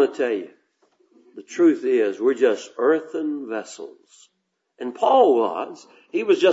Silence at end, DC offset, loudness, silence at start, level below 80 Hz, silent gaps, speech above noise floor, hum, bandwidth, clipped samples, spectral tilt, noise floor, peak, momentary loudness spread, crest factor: 0 s; under 0.1%; -21 LUFS; 0 s; -84 dBFS; none; 46 dB; none; 8 kHz; under 0.1%; -4.5 dB/octave; -67 dBFS; -4 dBFS; 18 LU; 18 dB